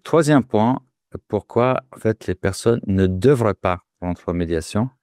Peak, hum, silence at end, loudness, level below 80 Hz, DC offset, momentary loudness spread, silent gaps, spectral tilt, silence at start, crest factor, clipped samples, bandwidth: -4 dBFS; none; 0.15 s; -20 LUFS; -46 dBFS; under 0.1%; 11 LU; none; -7 dB/octave; 0.05 s; 16 dB; under 0.1%; 15 kHz